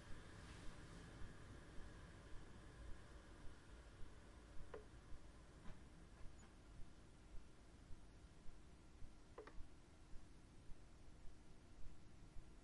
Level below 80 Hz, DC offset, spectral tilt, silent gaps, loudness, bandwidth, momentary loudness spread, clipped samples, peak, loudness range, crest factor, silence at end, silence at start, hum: -62 dBFS; under 0.1%; -5 dB/octave; none; -64 LUFS; 11 kHz; 6 LU; under 0.1%; -38 dBFS; 4 LU; 16 dB; 0 s; 0 s; none